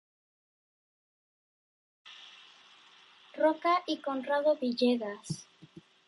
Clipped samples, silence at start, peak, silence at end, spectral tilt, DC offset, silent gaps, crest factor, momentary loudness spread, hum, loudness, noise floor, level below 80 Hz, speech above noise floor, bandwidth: under 0.1%; 2.05 s; -16 dBFS; 0.3 s; -5 dB/octave; under 0.1%; none; 18 dB; 21 LU; none; -30 LUFS; -59 dBFS; -80 dBFS; 29 dB; 11.5 kHz